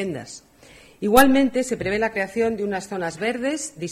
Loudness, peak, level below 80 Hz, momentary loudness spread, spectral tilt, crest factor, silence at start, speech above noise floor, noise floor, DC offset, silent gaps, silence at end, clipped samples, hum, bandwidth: -21 LUFS; 0 dBFS; -48 dBFS; 14 LU; -4 dB/octave; 22 dB; 0 s; 28 dB; -49 dBFS; under 0.1%; none; 0 s; under 0.1%; none; 16 kHz